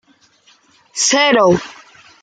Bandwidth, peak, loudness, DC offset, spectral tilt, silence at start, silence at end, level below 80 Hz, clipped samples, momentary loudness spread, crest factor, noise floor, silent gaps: 10 kHz; -2 dBFS; -13 LUFS; under 0.1%; -2.5 dB/octave; 0.95 s; 0.5 s; -56 dBFS; under 0.1%; 17 LU; 16 dB; -53 dBFS; none